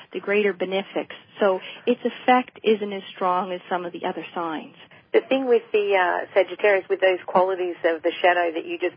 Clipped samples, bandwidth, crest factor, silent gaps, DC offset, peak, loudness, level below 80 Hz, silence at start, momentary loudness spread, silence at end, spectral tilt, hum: under 0.1%; 5.2 kHz; 18 dB; none; under 0.1%; -6 dBFS; -23 LUFS; -78 dBFS; 0 s; 10 LU; 0.05 s; -9.5 dB/octave; none